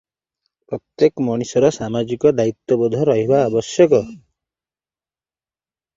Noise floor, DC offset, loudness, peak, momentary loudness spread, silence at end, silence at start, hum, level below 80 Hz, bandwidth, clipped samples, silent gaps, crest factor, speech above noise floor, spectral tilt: under -90 dBFS; under 0.1%; -17 LUFS; -2 dBFS; 11 LU; 1.8 s; 0.7 s; none; -56 dBFS; 7.8 kHz; under 0.1%; none; 18 dB; over 73 dB; -6.5 dB/octave